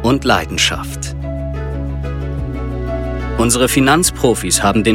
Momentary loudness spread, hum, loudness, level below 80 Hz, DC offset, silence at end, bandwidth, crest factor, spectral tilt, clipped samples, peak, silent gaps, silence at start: 11 LU; none; -16 LUFS; -26 dBFS; under 0.1%; 0 s; 17 kHz; 16 dB; -4 dB/octave; under 0.1%; 0 dBFS; none; 0 s